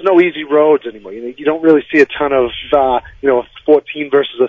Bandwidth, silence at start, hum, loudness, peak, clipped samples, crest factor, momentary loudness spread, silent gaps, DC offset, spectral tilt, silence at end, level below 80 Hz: 7.2 kHz; 0 s; none; -13 LUFS; 0 dBFS; 0.2%; 14 dB; 7 LU; none; under 0.1%; -6.5 dB/octave; 0 s; -46 dBFS